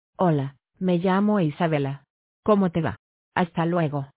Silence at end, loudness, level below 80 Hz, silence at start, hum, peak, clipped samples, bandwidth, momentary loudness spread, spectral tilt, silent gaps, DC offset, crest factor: 0.1 s; -24 LUFS; -56 dBFS; 0.2 s; none; -6 dBFS; under 0.1%; 4 kHz; 10 LU; -11.5 dB/octave; 2.10-2.43 s, 2.99-3.32 s; under 0.1%; 18 dB